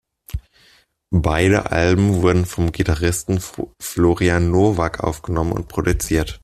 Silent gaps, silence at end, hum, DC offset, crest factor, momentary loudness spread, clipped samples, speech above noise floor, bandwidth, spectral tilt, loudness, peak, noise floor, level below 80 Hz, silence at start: none; 0.05 s; none; under 0.1%; 16 dB; 11 LU; under 0.1%; 37 dB; 14.5 kHz; -6 dB/octave; -19 LUFS; -2 dBFS; -55 dBFS; -34 dBFS; 0.35 s